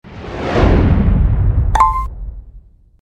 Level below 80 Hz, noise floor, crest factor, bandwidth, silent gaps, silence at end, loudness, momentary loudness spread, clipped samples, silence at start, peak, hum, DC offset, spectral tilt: -18 dBFS; -41 dBFS; 14 dB; 9.4 kHz; none; 0.55 s; -14 LUFS; 16 LU; under 0.1%; 0.05 s; 0 dBFS; none; under 0.1%; -8 dB/octave